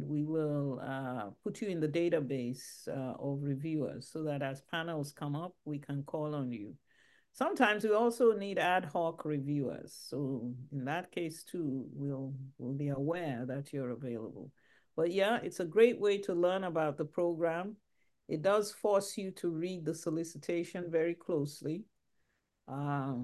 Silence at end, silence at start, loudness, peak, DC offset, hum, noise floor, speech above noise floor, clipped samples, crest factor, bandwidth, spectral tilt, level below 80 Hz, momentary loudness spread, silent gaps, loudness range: 0 s; 0 s; -35 LUFS; -12 dBFS; under 0.1%; none; -79 dBFS; 45 dB; under 0.1%; 22 dB; 12.5 kHz; -6 dB/octave; -78 dBFS; 12 LU; none; 7 LU